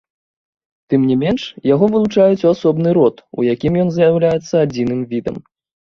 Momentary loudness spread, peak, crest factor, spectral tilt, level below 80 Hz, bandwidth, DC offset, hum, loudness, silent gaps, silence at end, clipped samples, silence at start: 7 LU; -2 dBFS; 14 dB; -8 dB/octave; -48 dBFS; 7.2 kHz; under 0.1%; none; -15 LUFS; none; 0.5 s; under 0.1%; 0.9 s